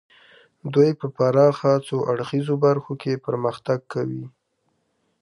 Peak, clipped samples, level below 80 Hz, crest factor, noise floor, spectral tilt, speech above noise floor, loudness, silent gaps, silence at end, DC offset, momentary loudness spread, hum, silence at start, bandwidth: -4 dBFS; under 0.1%; -68 dBFS; 18 dB; -71 dBFS; -8 dB/octave; 50 dB; -22 LUFS; none; 0.95 s; under 0.1%; 11 LU; none; 0.65 s; 11.5 kHz